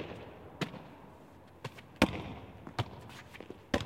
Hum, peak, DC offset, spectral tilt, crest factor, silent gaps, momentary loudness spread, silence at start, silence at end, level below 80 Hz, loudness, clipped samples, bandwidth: none; -10 dBFS; under 0.1%; -5.5 dB/octave; 30 dB; none; 22 LU; 0 s; 0 s; -56 dBFS; -39 LUFS; under 0.1%; 16.5 kHz